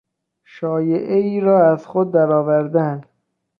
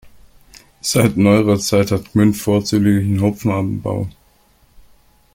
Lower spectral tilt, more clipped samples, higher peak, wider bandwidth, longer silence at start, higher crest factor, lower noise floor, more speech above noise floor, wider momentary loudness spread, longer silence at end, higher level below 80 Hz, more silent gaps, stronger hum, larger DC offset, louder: first, -10.5 dB/octave vs -6 dB/octave; neither; about the same, -2 dBFS vs -2 dBFS; second, 6 kHz vs 16.5 kHz; first, 0.55 s vs 0.05 s; about the same, 14 dB vs 16 dB; about the same, -55 dBFS vs -54 dBFS; about the same, 39 dB vs 39 dB; about the same, 10 LU vs 10 LU; second, 0.6 s vs 1.25 s; second, -66 dBFS vs -46 dBFS; neither; neither; neither; about the same, -17 LUFS vs -16 LUFS